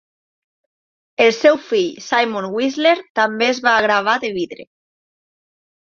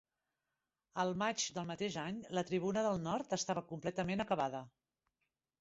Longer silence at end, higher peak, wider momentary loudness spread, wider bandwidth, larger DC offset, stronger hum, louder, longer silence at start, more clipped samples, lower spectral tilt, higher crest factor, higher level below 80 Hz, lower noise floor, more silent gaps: first, 1.3 s vs 0.95 s; first, -2 dBFS vs -22 dBFS; first, 8 LU vs 5 LU; about the same, 7.4 kHz vs 8 kHz; neither; neither; first, -17 LUFS vs -38 LUFS; first, 1.2 s vs 0.95 s; neither; about the same, -3.5 dB/octave vs -4.5 dB/octave; about the same, 18 dB vs 18 dB; first, -66 dBFS vs -72 dBFS; about the same, under -90 dBFS vs under -90 dBFS; first, 3.10-3.15 s vs none